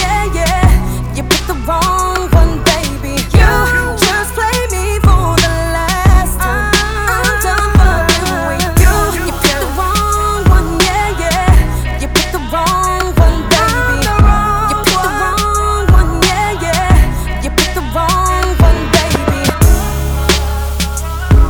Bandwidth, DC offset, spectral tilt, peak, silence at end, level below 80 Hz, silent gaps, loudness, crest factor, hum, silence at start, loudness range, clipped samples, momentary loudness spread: over 20 kHz; under 0.1%; -4.5 dB/octave; 0 dBFS; 0 s; -14 dBFS; none; -12 LUFS; 10 dB; none; 0 s; 1 LU; 0.4%; 5 LU